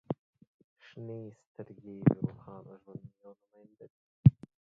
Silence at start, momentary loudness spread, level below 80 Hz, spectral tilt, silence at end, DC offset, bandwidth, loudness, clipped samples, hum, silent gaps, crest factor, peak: 0.1 s; 24 LU; -56 dBFS; -11 dB/octave; 0.4 s; under 0.1%; 3.7 kHz; -30 LUFS; under 0.1%; none; 0.19-0.33 s, 0.47-0.76 s, 1.47-1.55 s, 3.90-4.24 s; 26 dB; -8 dBFS